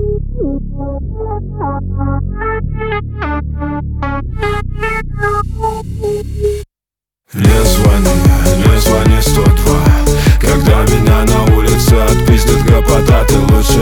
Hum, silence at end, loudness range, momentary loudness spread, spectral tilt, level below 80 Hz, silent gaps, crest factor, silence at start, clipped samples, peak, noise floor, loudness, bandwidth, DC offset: none; 0 s; 9 LU; 10 LU; -5.5 dB/octave; -14 dBFS; none; 10 dB; 0 s; under 0.1%; 0 dBFS; -88 dBFS; -12 LUFS; over 20 kHz; under 0.1%